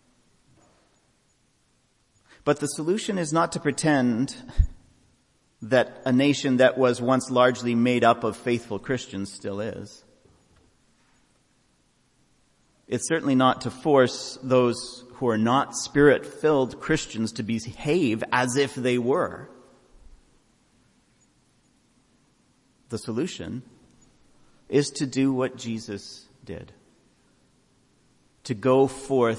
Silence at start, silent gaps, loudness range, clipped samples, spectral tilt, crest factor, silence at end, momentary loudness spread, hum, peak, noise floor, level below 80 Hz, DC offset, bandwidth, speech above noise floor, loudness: 2.45 s; none; 15 LU; under 0.1%; -5 dB/octave; 22 dB; 0 s; 15 LU; none; -4 dBFS; -66 dBFS; -42 dBFS; under 0.1%; 11.5 kHz; 43 dB; -24 LUFS